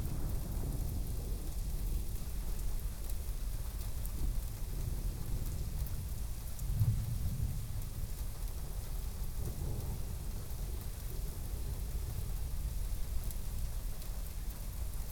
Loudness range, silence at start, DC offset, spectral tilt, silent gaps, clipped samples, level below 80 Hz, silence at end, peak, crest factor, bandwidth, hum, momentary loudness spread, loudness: 3 LU; 0 s; under 0.1%; -5.5 dB/octave; none; under 0.1%; -38 dBFS; 0 s; -18 dBFS; 18 dB; over 20 kHz; none; 5 LU; -41 LUFS